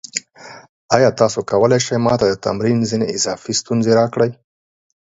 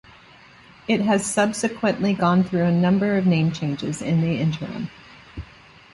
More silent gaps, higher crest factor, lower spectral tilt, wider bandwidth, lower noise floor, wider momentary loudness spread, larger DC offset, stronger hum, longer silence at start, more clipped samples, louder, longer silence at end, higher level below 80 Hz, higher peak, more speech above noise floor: first, 0.69-0.89 s vs none; about the same, 18 dB vs 16 dB; second, -4.5 dB/octave vs -6 dB/octave; second, 8 kHz vs 11.5 kHz; second, -40 dBFS vs -49 dBFS; second, 6 LU vs 18 LU; neither; neither; second, 0.15 s vs 0.9 s; neither; first, -17 LUFS vs -21 LUFS; first, 0.7 s vs 0.5 s; about the same, -52 dBFS vs -52 dBFS; first, 0 dBFS vs -6 dBFS; second, 24 dB vs 28 dB